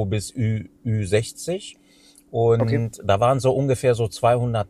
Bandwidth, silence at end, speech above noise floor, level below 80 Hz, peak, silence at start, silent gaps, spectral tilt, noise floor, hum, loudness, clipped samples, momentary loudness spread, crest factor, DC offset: 13.5 kHz; 0.05 s; 32 dB; -50 dBFS; -6 dBFS; 0 s; none; -6.5 dB/octave; -53 dBFS; none; -22 LUFS; under 0.1%; 10 LU; 16 dB; under 0.1%